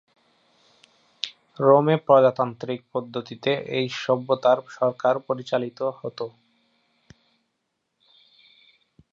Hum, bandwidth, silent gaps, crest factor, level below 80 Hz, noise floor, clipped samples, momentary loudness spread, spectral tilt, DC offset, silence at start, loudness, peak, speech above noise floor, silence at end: none; 7.4 kHz; none; 22 dB; -74 dBFS; -77 dBFS; under 0.1%; 16 LU; -6.5 dB/octave; under 0.1%; 1.25 s; -23 LUFS; -4 dBFS; 55 dB; 2.85 s